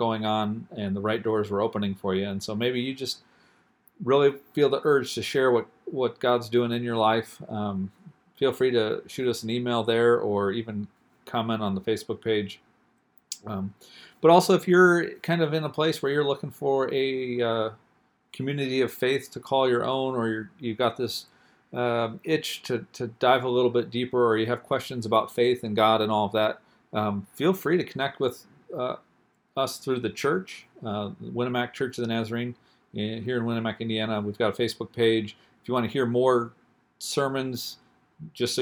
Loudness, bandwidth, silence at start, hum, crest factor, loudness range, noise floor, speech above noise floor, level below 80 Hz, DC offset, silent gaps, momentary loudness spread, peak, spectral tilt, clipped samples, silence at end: -26 LUFS; 19.5 kHz; 0 s; none; 24 dB; 6 LU; -66 dBFS; 41 dB; -70 dBFS; under 0.1%; none; 12 LU; -2 dBFS; -5.5 dB/octave; under 0.1%; 0 s